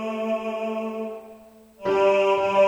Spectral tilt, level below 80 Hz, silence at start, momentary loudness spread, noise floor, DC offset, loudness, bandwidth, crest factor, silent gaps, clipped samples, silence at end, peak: -5.5 dB/octave; -64 dBFS; 0 s; 14 LU; -48 dBFS; under 0.1%; -24 LUFS; 9.6 kHz; 16 dB; none; under 0.1%; 0 s; -8 dBFS